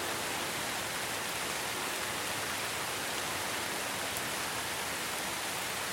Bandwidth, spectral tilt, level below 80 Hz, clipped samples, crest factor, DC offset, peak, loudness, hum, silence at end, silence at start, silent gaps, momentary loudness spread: 17 kHz; -1 dB/octave; -64 dBFS; under 0.1%; 22 dB; under 0.1%; -14 dBFS; -34 LUFS; none; 0 s; 0 s; none; 1 LU